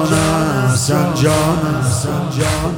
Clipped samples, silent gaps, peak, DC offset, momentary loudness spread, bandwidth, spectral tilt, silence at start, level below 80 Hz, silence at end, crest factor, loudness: under 0.1%; none; 0 dBFS; under 0.1%; 4 LU; 17.5 kHz; -5 dB/octave; 0 s; -34 dBFS; 0 s; 14 dB; -15 LUFS